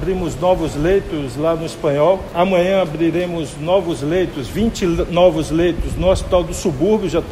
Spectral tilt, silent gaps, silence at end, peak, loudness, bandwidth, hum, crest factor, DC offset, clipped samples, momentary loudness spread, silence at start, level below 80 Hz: -6 dB/octave; none; 0 s; 0 dBFS; -17 LUFS; 15 kHz; none; 16 dB; under 0.1%; under 0.1%; 6 LU; 0 s; -30 dBFS